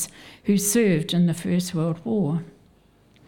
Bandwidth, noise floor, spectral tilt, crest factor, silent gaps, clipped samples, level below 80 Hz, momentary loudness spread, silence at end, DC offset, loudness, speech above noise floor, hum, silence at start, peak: 18.5 kHz; -57 dBFS; -5.5 dB/octave; 14 dB; none; under 0.1%; -60 dBFS; 10 LU; 0.8 s; under 0.1%; -23 LUFS; 35 dB; none; 0 s; -10 dBFS